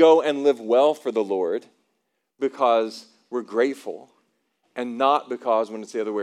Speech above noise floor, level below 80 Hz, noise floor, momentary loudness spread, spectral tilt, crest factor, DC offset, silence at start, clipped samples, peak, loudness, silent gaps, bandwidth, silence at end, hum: 53 dB; under -90 dBFS; -75 dBFS; 14 LU; -4.5 dB/octave; 18 dB; under 0.1%; 0 s; under 0.1%; -4 dBFS; -23 LUFS; none; 11.5 kHz; 0 s; none